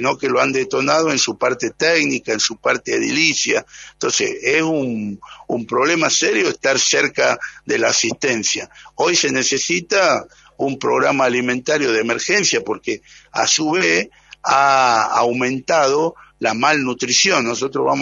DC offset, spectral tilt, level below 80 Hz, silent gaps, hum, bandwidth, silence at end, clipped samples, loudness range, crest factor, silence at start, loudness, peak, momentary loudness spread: under 0.1%; -2 dB/octave; -60 dBFS; none; none; 7.8 kHz; 0 s; under 0.1%; 2 LU; 18 dB; 0 s; -17 LUFS; 0 dBFS; 9 LU